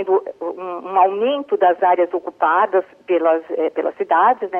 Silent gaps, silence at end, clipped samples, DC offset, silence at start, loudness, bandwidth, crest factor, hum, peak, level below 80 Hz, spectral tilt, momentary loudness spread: none; 0 s; under 0.1%; under 0.1%; 0 s; -18 LUFS; 3.6 kHz; 14 dB; none; -4 dBFS; -74 dBFS; -6.5 dB/octave; 8 LU